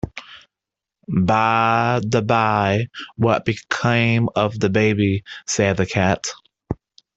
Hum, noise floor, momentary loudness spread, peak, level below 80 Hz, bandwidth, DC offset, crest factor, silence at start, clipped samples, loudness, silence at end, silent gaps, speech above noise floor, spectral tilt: none; -86 dBFS; 13 LU; -2 dBFS; -50 dBFS; 8.2 kHz; under 0.1%; 18 dB; 0.05 s; under 0.1%; -19 LUFS; 0.4 s; none; 67 dB; -5.5 dB/octave